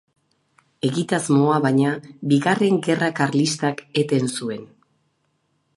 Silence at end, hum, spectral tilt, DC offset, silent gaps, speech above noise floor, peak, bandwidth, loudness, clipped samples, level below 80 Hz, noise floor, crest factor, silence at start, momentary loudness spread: 1.1 s; none; -5.5 dB/octave; under 0.1%; none; 49 dB; -2 dBFS; 11.5 kHz; -21 LUFS; under 0.1%; -68 dBFS; -69 dBFS; 18 dB; 0.85 s; 9 LU